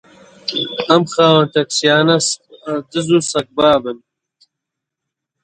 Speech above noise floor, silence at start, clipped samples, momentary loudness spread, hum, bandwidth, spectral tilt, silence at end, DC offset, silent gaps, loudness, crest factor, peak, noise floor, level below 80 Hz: 66 dB; 0.45 s; under 0.1%; 13 LU; none; 10.5 kHz; -4 dB/octave; 1.45 s; under 0.1%; none; -15 LUFS; 16 dB; 0 dBFS; -81 dBFS; -56 dBFS